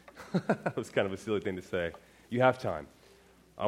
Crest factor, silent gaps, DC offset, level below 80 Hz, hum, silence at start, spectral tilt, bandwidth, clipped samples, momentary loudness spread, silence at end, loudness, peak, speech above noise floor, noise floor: 22 dB; none; under 0.1%; -64 dBFS; none; 0.15 s; -6.5 dB/octave; 15.5 kHz; under 0.1%; 12 LU; 0 s; -32 LUFS; -10 dBFS; 29 dB; -60 dBFS